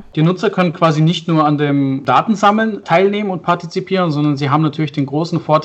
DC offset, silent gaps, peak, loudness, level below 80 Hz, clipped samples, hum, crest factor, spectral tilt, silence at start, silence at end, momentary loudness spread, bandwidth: under 0.1%; none; 0 dBFS; -15 LUFS; -56 dBFS; under 0.1%; none; 14 dB; -7 dB/octave; 0 s; 0 s; 6 LU; 8.2 kHz